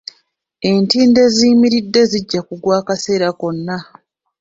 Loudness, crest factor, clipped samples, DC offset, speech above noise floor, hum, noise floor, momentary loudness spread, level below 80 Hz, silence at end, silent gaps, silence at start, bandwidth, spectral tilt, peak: -14 LUFS; 14 dB; under 0.1%; under 0.1%; 47 dB; none; -60 dBFS; 12 LU; -54 dBFS; 0.6 s; none; 0.6 s; 7.8 kHz; -5 dB/octave; 0 dBFS